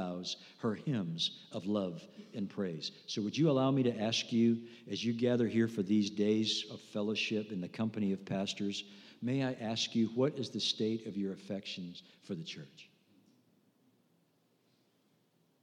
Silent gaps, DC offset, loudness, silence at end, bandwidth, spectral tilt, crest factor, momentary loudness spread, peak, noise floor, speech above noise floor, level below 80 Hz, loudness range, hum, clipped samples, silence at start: none; under 0.1%; -35 LUFS; 2.8 s; 10.5 kHz; -5.5 dB/octave; 18 dB; 12 LU; -18 dBFS; -74 dBFS; 39 dB; -86 dBFS; 13 LU; none; under 0.1%; 0 s